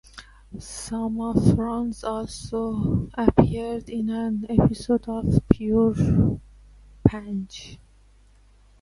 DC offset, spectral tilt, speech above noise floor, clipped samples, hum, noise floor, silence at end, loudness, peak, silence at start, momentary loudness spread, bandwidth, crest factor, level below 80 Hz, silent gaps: under 0.1%; -8 dB/octave; 32 dB; under 0.1%; none; -54 dBFS; 1.05 s; -24 LUFS; 0 dBFS; 0.15 s; 14 LU; 11.5 kHz; 24 dB; -38 dBFS; none